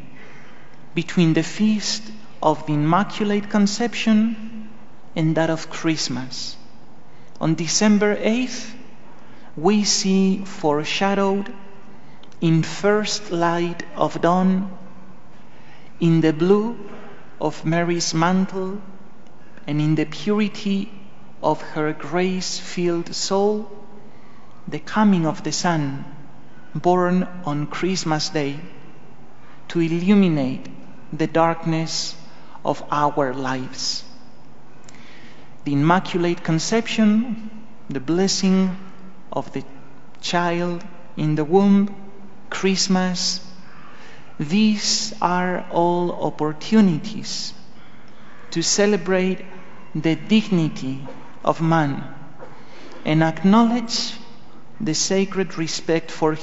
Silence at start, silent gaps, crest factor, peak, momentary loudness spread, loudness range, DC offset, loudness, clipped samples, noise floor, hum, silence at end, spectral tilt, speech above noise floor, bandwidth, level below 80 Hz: 0 s; none; 20 dB; 0 dBFS; 15 LU; 3 LU; 3%; -21 LUFS; under 0.1%; -48 dBFS; none; 0 s; -5 dB/octave; 28 dB; 8 kHz; -60 dBFS